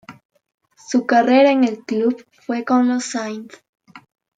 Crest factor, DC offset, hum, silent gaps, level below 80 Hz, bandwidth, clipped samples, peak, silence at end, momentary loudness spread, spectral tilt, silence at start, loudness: 16 dB; under 0.1%; none; 0.25-0.29 s, 0.54-0.58 s, 3.69-3.73 s; -74 dBFS; 9.2 kHz; under 0.1%; -4 dBFS; 0.4 s; 14 LU; -4 dB/octave; 0.1 s; -18 LUFS